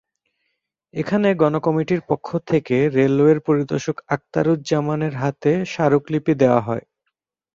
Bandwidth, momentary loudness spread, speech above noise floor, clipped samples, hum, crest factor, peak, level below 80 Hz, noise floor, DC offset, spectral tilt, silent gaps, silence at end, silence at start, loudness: 7.6 kHz; 8 LU; 58 dB; under 0.1%; none; 18 dB; -2 dBFS; -58 dBFS; -77 dBFS; under 0.1%; -7.5 dB/octave; none; 0.75 s; 0.95 s; -20 LUFS